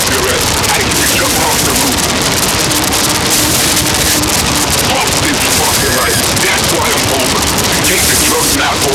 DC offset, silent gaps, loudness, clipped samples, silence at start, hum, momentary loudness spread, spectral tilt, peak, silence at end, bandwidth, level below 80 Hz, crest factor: under 0.1%; none; -9 LUFS; under 0.1%; 0 s; none; 2 LU; -2 dB/octave; 0 dBFS; 0 s; over 20 kHz; -28 dBFS; 10 dB